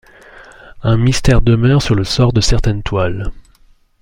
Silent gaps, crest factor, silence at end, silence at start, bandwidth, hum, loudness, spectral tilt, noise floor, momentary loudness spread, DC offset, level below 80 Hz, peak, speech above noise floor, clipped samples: none; 14 dB; 0.6 s; 0.35 s; 11.5 kHz; none; -14 LUFS; -6 dB/octave; -49 dBFS; 9 LU; under 0.1%; -22 dBFS; 0 dBFS; 37 dB; under 0.1%